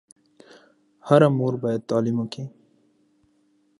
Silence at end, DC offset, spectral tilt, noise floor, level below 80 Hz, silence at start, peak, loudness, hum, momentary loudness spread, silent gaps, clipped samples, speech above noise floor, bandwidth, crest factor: 1.3 s; under 0.1%; -8 dB/octave; -64 dBFS; -70 dBFS; 1.05 s; -2 dBFS; -22 LUFS; none; 20 LU; none; under 0.1%; 43 dB; 11.5 kHz; 24 dB